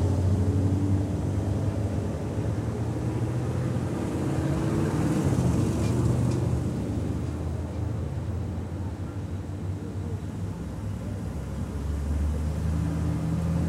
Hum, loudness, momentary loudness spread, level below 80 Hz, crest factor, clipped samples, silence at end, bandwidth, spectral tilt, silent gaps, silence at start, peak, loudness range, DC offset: none; -29 LUFS; 9 LU; -36 dBFS; 16 dB; under 0.1%; 0 s; 13.5 kHz; -8 dB/octave; none; 0 s; -12 dBFS; 7 LU; under 0.1%